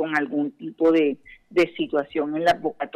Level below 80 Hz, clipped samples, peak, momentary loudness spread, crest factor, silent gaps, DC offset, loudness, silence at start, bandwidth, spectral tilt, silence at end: -62 dBFS; under 0.1%; -10 dBFS; 7 LU; 12 dB; none; under 0.1%; -23 LUFS; 0 s; 11.5 kHz; -6 dB/octave; 0.1 s